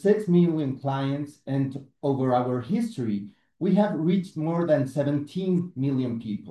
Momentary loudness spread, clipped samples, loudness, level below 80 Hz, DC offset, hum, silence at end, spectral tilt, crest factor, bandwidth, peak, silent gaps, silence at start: 9 LU; under 0.1%; -26 LUFS; -68 dBFS; under 0.1%; none; 0 s; -9 dB/octave; 16 dB; 11.5 kHz; -8 dBFS; none; 0 s